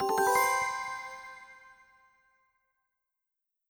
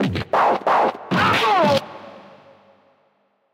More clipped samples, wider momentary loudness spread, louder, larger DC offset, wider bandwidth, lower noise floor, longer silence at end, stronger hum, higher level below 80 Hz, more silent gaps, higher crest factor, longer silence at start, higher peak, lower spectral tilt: neither; first, 23 LU vs 8 LU; second, -29 LUFS vs -18 LUFS; neither; first, over 20 kHz vs 16.5 kHz; first, -87 dBFS vs -64 dBFS; first, 2 s vs 1.3 s; second, none vs 50 Hz at -45 dBFS; second, -70 dBFS vs -54 dBFS; neither; about the same, 20 dB vs 16 dB; about the same, 0 s vs 0 s; second, -14 dBFS vs -4 dBFS; second, -1.5 dB/octave vs -5.5 dB/octave